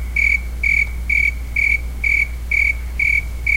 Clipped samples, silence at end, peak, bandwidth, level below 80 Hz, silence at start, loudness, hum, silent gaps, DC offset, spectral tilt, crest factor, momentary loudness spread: under 0.1%; 0 s; -6 dBFS; 16.5 kHz; -26 dBFS; 0 s; -16 LUFS; none; none; under 0.1%; -4 dB/octave; 12 dB; 2 LU